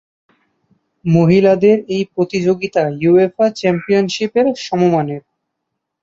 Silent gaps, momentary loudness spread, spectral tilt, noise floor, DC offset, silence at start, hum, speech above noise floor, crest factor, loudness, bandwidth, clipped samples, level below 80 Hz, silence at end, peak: none; 7 LU; -7 dB/octave; -76 dBFS; under 0.1%; 1.05 s; none; 62 dB; 14 dB; -15 LUFS; 7.8 kHz; under 0.1%; -56 dBFS; 0.85 s; -2 dBFS